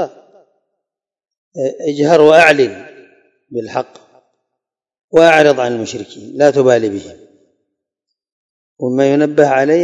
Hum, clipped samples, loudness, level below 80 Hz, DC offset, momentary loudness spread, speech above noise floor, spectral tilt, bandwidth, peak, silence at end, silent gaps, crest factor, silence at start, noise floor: none; 0.5%; -12 LUFS; -60 dBFS; under 0.1%; 19 LU; 69 dB; -5.5 dB/octave; 12 kHz; 0 dBFS; 0 s; 1.38-1.52 s, 5.04-5.08 s, 8.32-8.77 s; 14 dB; 0 s; -80 dBFS